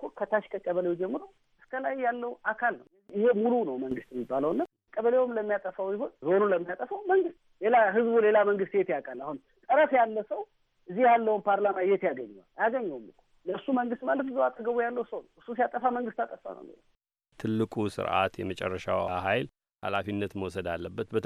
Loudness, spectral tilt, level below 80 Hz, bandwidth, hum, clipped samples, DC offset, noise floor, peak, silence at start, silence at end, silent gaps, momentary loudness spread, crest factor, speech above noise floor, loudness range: -29 LUFS; -7 dB/octave; -66 dBFS; 11.5 kHz; none; under 0.1%; under 0.1%; -60 dBFS; -12 dBFS; 0 s; 0 s; none; 15 LU; 16 dB; 32 dB; 6 LU